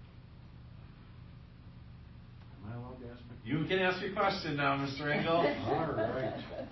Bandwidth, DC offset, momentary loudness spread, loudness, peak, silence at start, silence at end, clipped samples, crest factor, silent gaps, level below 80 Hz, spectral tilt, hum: 6 kHz; under 0.1%; 23 LU; -33 LUFS; -18 dBFS; 0 s; 0 s; under 0.1%; 18 dB; none; -56 dBFS; -4 dB/octave; none